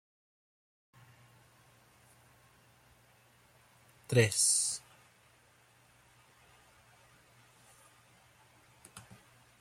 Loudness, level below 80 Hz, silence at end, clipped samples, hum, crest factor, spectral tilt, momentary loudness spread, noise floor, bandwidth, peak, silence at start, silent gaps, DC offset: -29 LUFS; -72 dBFS; 0.6 s; under 0.1%; none; 26 dB; -3 dB/octave; 28 LU; -65 dBFS; 16 kHz; -14 dBFS; 4.1 s; none; under 0.1%